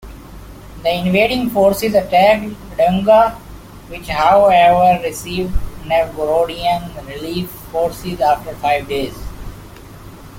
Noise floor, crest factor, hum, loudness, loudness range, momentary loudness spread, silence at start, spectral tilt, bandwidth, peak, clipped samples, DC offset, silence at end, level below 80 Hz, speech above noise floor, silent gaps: -36 dBFS; 16 dB; none; -15 LUFS; 7 LU; 16 LU; 0.05 s; -5.5 dB/octave; 17 kHz; 0 dBFS; under 0.1%; under 0.1%; 0 s; -34 dBFS; 21 dB; none